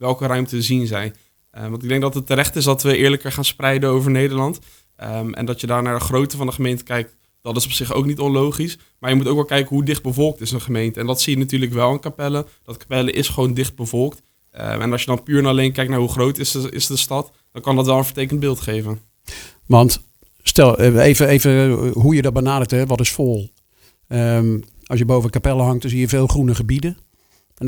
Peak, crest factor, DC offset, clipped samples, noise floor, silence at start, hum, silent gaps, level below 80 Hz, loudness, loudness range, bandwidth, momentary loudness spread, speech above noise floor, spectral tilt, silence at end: 0 dBFS; 18 dB; under 0.1%; under 0.1%; -58 dBFS; 0 s; none; none; -36 dBFS; -18 LUFS; 6 LU; over 20 kHz; 13 LU; 41 dB; -5 dB/octave; 0 s